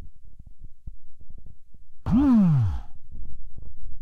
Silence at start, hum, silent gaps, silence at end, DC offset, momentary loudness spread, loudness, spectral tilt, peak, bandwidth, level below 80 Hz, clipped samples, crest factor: 0 s; none; none; 0 s; under 0.1%; 28 LU; -21 LUFS; -10.5 dB/octave; -12 dBFS; 6 kHz; -38 dBFS; under 0.1%; 12 dB